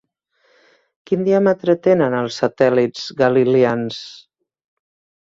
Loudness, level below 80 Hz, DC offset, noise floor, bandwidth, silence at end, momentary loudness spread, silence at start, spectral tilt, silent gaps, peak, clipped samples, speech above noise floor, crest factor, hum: -17 LUFS; -60 dBFS; under 0.1%; -63 dBFS; 7.6 kHz; 1.05 s; 9 LU; 1.1 s; -6.5 dB/octave; none; -2 dBFS; under 0.1%; 46 dB; 18 dB; none